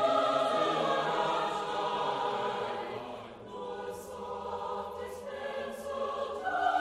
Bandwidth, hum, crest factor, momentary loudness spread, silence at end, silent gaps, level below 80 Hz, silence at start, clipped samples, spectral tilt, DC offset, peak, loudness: 14.5 kHz; none; 18 dB; 13 LU; 0 s; none; -66 dBFS; 0 s; under 0.1%; -4 dB/octave; under 0.1%; -16 dBFS; -33 LUFS